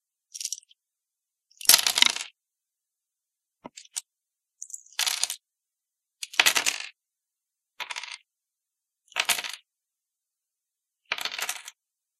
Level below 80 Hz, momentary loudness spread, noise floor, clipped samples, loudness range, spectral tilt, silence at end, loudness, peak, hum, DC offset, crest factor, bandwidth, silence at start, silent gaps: -82 dBFS; 22 LU; -87 dBFS; under 0.1%; 9 LU; 3 dB/octave; 0.5 s; -24 LUFS; 0 dBFS; none; under 0.1%; 32 dB; 14.5 kHz; 0.35 s; none